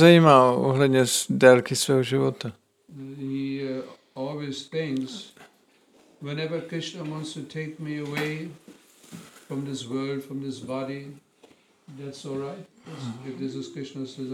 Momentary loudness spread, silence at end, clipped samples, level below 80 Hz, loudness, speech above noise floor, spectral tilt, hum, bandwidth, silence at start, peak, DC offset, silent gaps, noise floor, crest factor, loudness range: 24 LU; 0 s; under 0.1%; -66 dBFS; -25 LUFS; 36 dB; -5 dB/octave; none; 16 kHz; 0 s; -2 dBFS; under 0.1%; none; -61 dBFS; 24 dB; 14 LU